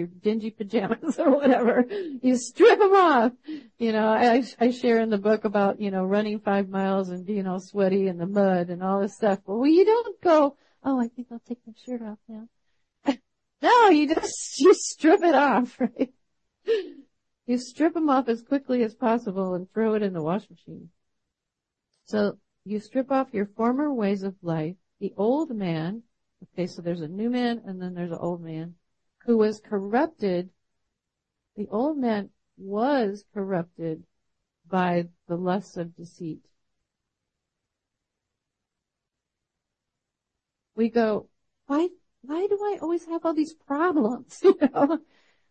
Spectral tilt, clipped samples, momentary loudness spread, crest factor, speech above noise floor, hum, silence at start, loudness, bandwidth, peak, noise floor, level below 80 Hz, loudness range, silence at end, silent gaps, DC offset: -6 dB/octave; under 0.1%; 16 LU; 18 dB; 62 dB; none; 0 s; -24 LUFS; 8.8 kHz; -6 dBFS; -86 dBFS; -70 dBFS; 10 LU; 0.5 s; none; under 0.1%